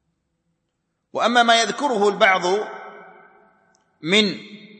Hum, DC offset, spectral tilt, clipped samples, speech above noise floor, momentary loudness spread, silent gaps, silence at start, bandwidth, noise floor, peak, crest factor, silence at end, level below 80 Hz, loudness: none; under 0.1%; -3 dB/octave; under 0.1%; 56 dB; 18 LU; none; 1.15 s; 8.8 kHz; -75 dBFS; -2 dBFS; 20 dB; 0.15 s; -70 dBFS; -18 LUFS